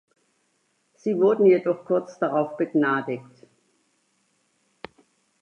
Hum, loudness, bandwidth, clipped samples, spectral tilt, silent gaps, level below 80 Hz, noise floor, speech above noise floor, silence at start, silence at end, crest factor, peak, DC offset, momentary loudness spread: none; -23 LUFS; 7 kHz; under 0.1%; -8 dB/octave; none; -76 dBFS; -70 dBFS; 48 dB; 1.05 s; 2.2 s; 18 dB; -8 dBFS; under 0.1%; 26 LU